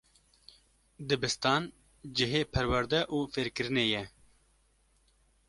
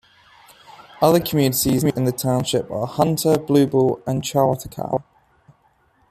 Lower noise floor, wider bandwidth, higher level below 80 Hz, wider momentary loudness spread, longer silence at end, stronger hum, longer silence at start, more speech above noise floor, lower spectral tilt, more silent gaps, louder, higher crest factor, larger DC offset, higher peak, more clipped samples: first, -69 dBFS vs -60 dBFS; second, 11.5 kHz vs 15.5 kHz; about the same, -52 dBFS vs -52 dBFS; first, 13 LU vs 9 LU; first, 1.4 s vs 1.1 s; neither; about the same, 1 s vs 0.95 s; about the same, 38 dB vs 41 dB; about the same, -4.5 dB/octave vs -5.5 dB/octave; neither; second, -30 LUFS vs -20 LUFS; about the same, 22 dB vs 18 dB; neither; second, -12 dBFS vs -2 dBFS; neither